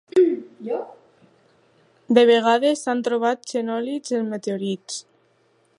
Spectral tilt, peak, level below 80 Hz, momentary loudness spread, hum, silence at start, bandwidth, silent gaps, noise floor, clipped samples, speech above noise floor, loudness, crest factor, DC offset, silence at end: -4.5 dB/octave; -2 dBFS; -78 dBFS; 14 LU; none; 0.15 s; 11 kHz; none; -62 dBFS; under 0.1%; 41 dB; -21 LUFS; 20 dB; under 0.1%; 0.75 s